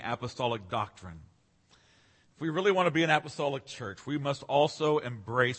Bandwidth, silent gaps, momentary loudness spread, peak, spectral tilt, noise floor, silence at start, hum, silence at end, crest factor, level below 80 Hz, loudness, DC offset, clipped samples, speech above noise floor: 8.8 kHz; none; 13 LU; -8 dBFS; -5.5 dB/octave; -65 dBFS; 0 s; none; 0 s; 22 dB; -66 dBFS; -30 LUFS; under 0.1%; under 0.1%; 35 dB